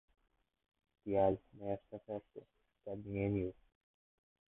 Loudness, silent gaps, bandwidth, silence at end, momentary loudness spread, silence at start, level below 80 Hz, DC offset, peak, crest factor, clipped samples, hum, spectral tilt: -40 LUFS; none; 3.9 kHz; 1 s; 19 LU; 1.05 s; -64 dBFS; under 0.1%; -20 dBFS; 22 dB; under 0.1%; none; -6 dB/octave